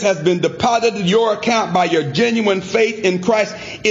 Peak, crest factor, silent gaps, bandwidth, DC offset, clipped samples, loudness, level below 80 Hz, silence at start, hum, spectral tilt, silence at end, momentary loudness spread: -2 dBFS; 14 dB; none; 8 kHz; under 0.1%; under 0.1%; -16 LUFS; -54 dBFS; 0 s; none; -4.5 dB/octave; 0 s; 2 LU